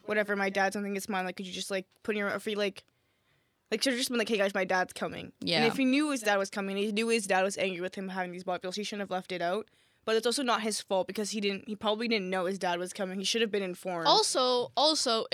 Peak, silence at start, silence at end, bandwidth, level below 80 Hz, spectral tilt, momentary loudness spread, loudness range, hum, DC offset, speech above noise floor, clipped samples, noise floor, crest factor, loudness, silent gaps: -10 dBFS; 0.05 s; 0.05 s; 16.5 kHz; -78 dBFS; -3 dB/octave; 10 LU; 4 LU; none; under 0.1%; 42 dB; under 0.1%; -72 dBFS; 20 dB; -30 LUFS; none